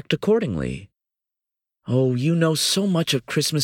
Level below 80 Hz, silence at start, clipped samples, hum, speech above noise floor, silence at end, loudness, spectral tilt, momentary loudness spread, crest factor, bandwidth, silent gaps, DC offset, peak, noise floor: -50 dBFS; 0.1 s; under 0.1%; none; 66 dB; 0 s; -21 LUFS; -5 dB/octave; 10 LU; 16 dB; 17.5 kHz; none; under 0.1%; -6 dBFS; -87 dBFS